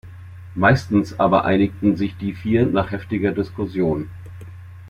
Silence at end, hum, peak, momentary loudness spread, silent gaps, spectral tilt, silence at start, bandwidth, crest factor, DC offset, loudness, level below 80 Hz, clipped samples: 0 s; none; -2 dBFS; 21 LU; none; -8 dB/octave; 0.05 s; 11.5 kHz; 18 dB; under 0.1%; -20 LUFS; -48 dBFS; under 0.1%